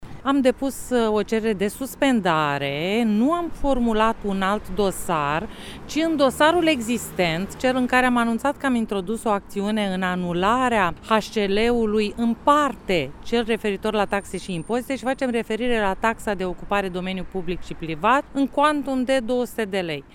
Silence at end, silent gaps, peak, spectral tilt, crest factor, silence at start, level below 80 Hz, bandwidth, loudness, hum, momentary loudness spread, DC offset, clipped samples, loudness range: 0.1 s; none; -4 dBFS; -5 dB/octave; 18 dB; 0 s; -42 dBFS; 17.5 kHz; -22 LUFS; none; 8 LU; under 0.1%; under 0.1%; 3 LU